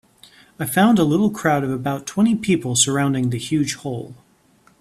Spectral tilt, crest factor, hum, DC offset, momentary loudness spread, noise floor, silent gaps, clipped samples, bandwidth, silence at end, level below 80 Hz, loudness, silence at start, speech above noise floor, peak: -4.5 dB/octave; 18 dB; none; under 0.1%; 12 LU; -56 dBFS; none; under 0.1%; 14.5 kHz; 0.65 s; -54 dBFS; -19 LUFS; 0.6 s; 37 dB; -2 dBFS